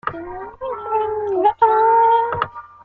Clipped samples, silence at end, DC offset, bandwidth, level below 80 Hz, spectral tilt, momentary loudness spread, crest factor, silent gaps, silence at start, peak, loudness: under 0.1%; 0.2 s; under 0.1%; 4.5 kHz; -52 dBFS; -8 dB/octave; 16 LU; 16 dB; none; 0.05 s; -2 dBFS; -17 LUFS